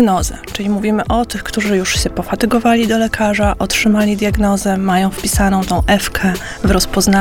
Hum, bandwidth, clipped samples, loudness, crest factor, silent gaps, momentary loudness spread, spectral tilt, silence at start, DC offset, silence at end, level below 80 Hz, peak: none; 17.5 kHz; under 0.1%; -15 LUFS; 14 dB; none; 6 LU; -4.5 dB/octave; 0 s; under 0.1%; 0 s; -26 dBFS; 0 dBFS